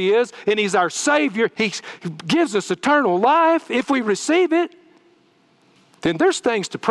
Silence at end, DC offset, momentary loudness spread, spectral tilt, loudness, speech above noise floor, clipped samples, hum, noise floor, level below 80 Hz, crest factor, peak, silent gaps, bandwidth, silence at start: 0 s; under 0.1%; 7 LU; -4 dB/octave; -19 LUFS; 39 dB; under 0.1%; none; -58 dBFS; -64 dBFS; 16 dB; -4 dBFS; none; 12 kHz; 0 s